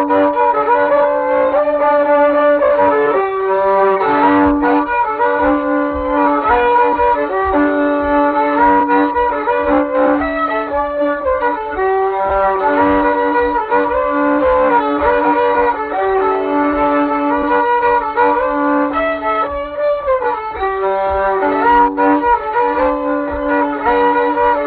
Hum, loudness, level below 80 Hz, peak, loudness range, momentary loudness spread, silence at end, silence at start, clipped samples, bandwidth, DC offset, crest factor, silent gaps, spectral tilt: none; -14 LUFS; -38 dBFS; 0 dBFS; 3 LU; 5 LU; 0 s; 0 s; under 0.1%; 4.7 kHz; under 0.1%; 14 dB; none; -9.5 dB/octave